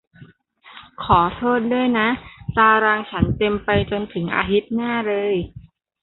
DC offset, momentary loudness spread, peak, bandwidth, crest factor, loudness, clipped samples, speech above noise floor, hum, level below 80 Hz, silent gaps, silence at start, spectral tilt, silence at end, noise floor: under 0.1%; 9 LU; -2 dBFS; 4.2 kHz; 18 dB; -19 LUFS; under 0.1%; 30 dB; none; -40 dBFS; none; 0.2 s; -11 dB/octave; 0.4 s; -49 dBFS